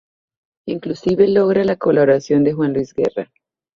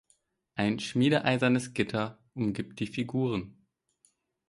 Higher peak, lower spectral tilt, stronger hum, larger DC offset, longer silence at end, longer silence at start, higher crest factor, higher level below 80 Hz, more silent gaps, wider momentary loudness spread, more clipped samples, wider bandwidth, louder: first, -2 dBFS vs -10 dBFS; first, -7.5 dB/octave vs -6 dB/octave; neither; neither; second, 0.55 s vs 1 s; about the same, 0.65 s vs 0.55 s; second, 14 dB vs 22 dB; first, -54 dBFS vs -62 dBFS; neither; first, 14 LU vs 11 LU; neither; second, 7.2 kHz vs 11.5 kHz; first, -17 LUFS vs -30 LUFS